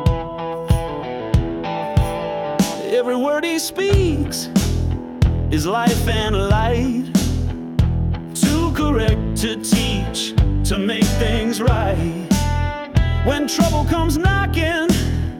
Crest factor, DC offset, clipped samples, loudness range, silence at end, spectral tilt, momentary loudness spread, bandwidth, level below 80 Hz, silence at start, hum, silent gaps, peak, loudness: 14 dB; under 0.1%; under 0.1%; 1 LU; 0 s; -5.5 dB/octave; 5 LU; 17.5 kHz; -26 dBFS; 0 s; none; none; -4 dBFS; -19 LUFS